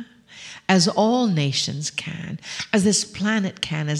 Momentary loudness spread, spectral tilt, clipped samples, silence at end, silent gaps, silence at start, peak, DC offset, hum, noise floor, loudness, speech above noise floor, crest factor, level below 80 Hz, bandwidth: 14 LU; -4 dB/octave; under 0.1%; 0 s; none; 0 s; -4 dBFS; under 0.1%; none; -43 dBFS; -21 LUFS; 21 dB; 20 dB; -60 dBFS; 12.5 kHz